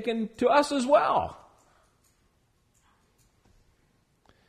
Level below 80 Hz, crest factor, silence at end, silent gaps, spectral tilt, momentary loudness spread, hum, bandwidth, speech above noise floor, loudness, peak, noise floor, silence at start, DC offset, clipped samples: -62 dBFS; 22 dB; 3.15 s; none; -4.5 dB/octave; 8 LU; none; 13 kHz; 44 dB; -25 LUFS; -8 dBFS; -68 dBFS; 0 s; under 0.1%; under 0.1%